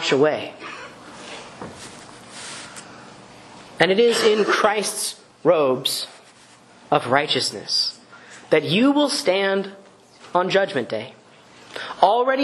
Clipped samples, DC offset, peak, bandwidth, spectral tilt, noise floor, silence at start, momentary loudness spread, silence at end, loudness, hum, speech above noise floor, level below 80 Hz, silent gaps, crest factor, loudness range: under 0.1%; under 0.1%; 0 dBFS; 12.5 kHz; -3.5 dB/octave; -49 dBFS; 0 s; 21 LU; 0 s; -20 LUFS; none; 30 dB; -66 dBFS; none; 22 dB; 7 LU